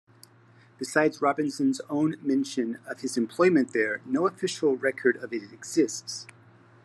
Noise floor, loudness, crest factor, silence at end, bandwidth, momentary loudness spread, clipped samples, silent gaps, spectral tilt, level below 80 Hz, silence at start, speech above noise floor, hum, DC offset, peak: -57 dBFS; -27 LUFS; 20 dB; 0.6 s; 12.5 kHz; 12 LU; under 0.1%; none; -4.5 dB/octave; -80 dBFS; 0.8 s; 30 dB; none; under 0.1%; -8 dBFS